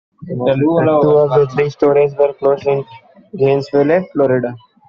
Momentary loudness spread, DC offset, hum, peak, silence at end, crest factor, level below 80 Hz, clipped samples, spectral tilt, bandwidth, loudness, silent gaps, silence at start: 9 LU; under 0.1%; none; -2 dBFS; 0.3 s; 12 dB; -54 dBFS; under 0.1%; -7 dB/octave; 6.8 kHz; -14 LUFS; none; 0.2 s